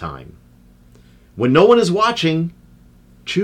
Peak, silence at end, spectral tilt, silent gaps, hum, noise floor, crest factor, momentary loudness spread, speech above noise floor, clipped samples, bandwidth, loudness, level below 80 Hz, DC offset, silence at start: -2 dBFS; 0 s; -6 dB/octave; none; none; -48 dBFS; 16 dB; 20 LU; 33 dB; under 0.1%; 11.5 kHz; -15 LUFS; -50 dBFS; under 0.1%; 0 s